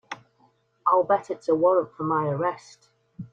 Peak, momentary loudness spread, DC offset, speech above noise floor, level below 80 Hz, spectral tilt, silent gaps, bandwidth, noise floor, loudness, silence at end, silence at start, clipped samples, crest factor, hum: -8 dBFS; 20 LU; under 0.1%; 40 dB; -68 dBFS; -7.5 dB/octave; none; 8 kHz; -64 dBFS; -24 LUFS; 0.05 s; 0.1 s; under 0.1%; 18 dB; none